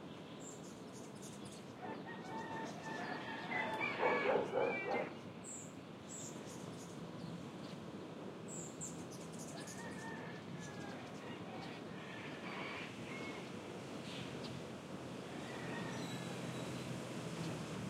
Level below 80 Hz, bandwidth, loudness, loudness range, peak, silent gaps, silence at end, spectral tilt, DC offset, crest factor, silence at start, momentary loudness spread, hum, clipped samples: -78 dBFS; 16 kHz; -45 LUFS; 9 LU; -22 dBFS; none; 0 s; -4.5 dB/octave; under 0.1%; 22 dB; 0 s; 12 LU; none; under 0.1%